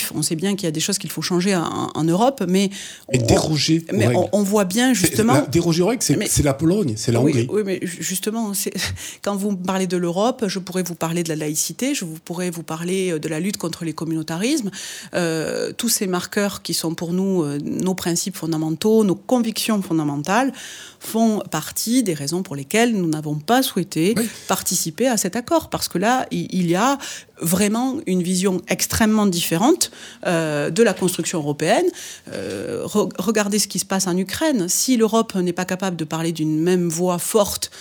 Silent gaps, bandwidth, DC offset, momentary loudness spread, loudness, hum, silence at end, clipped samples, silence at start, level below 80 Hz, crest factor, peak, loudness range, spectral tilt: none; over 20 kHz; under 0.1%; 8 LU; -20 LUFS; none; 0 s; under 0.1%; 0 s; -48 dBFS; 20 dB; 0 dBFS; 5 LU; -4.5 dB/octave